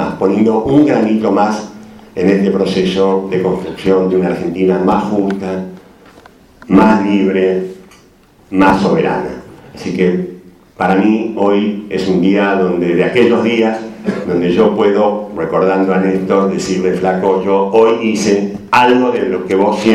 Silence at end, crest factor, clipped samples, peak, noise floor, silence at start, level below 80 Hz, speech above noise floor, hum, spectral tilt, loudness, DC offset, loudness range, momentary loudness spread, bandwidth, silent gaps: 0 s; 12 dB; under 0.1%; 0 dBFS; -46 dBFS; 0 s; -46 dBFS; 34 dB; none; -6.5 dB/octave; -13 LUFS; under 0.1%; 3 LU; 9 LU; 12 kHz; none